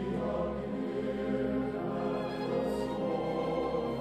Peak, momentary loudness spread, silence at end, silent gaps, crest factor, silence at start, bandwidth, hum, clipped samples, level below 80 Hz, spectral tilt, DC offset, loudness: -20 dBFS; 2 LU; 0 s; none; 14 dB; 0 s; 13.5 kHz; none; under 0.1%; -52 dBFS; -7.5 dB/octave; under 0.1%; -34 LUFS